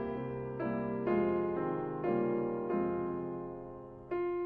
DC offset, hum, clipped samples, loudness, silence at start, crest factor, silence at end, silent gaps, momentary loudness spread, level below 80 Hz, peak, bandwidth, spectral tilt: under 0.1%; none; under 0.1%; -35 LUFS; 0 s; 14 dB; 0 s; none; 10 LU; -62 dBFS; -20 dBFS; 4.2 kHz; -11 dB/octave